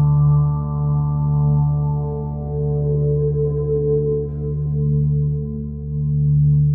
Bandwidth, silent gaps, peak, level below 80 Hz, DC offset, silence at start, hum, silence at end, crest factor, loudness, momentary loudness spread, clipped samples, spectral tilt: 1.4 kHz; none; -8 dBFS; -30 dBFS; under 0.1%; 0 s; none; 0 s; 10 dB; -19 LUFS; 9 LU; under 0.1%; -17.5 dB/octave